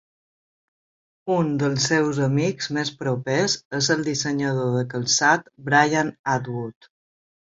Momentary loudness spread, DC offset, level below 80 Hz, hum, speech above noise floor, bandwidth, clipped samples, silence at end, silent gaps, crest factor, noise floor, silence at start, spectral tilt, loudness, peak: 8 LU; under 0.1%; -62 dBFS; none; over 68 dB; 7.8 kHz; under 0.1%; 0.85 s; 3.65-3.71 s, 6.19-6.24 s; 20 dB; under -90 dBFS; 1.25 s; -4 dB/octave; -22 LUFS; -4 dBFS